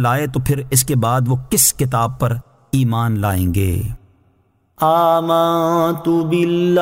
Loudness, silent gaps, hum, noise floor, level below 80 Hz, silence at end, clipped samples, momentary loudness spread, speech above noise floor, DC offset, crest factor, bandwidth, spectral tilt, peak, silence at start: -16 LUFS; none; none; -59 dBFS; -38 dBFS; 0 s; under 0.1%; 8 LU; 43 dB; under 0.1%; 16 dB; 16.5 kHz; -5 dB/octave; -2 dBFS; 0 s